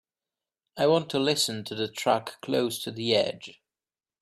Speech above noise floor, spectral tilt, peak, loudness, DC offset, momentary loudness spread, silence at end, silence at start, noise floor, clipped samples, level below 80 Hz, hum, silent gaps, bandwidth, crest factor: over 63 dB; -4 dB/octave; -10 dBFS; -27 LUFS; under 0.1%; 8 LU; 0.7 s; 0.75 s; under -90 dBFS; under 0.1%; -72 dBFS; none; none; 15.5 kHz; 18 dB